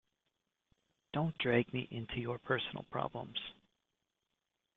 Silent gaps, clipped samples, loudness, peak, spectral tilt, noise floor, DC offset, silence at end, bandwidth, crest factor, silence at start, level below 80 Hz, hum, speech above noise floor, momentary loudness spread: none; under 0.1%; -38 LUFS; -16 dBFS; -4 dB/octave; -87 dBFS; under 0.1%; 1.25 s; 4.5 kHz; 24 dB; 1.15 s; -66 dBFS; none; 50 dB; 10 LU